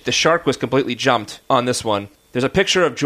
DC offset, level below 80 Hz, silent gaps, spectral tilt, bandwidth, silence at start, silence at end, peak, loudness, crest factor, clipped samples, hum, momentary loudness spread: under 0.1%; -48 dBFS; none; -3.5 dB/octave; 15.5 kHz; 0.05 s; 0 s; -2 dBFS; -18 LUFS; 18 dB; under 0.1%; none; 7 LU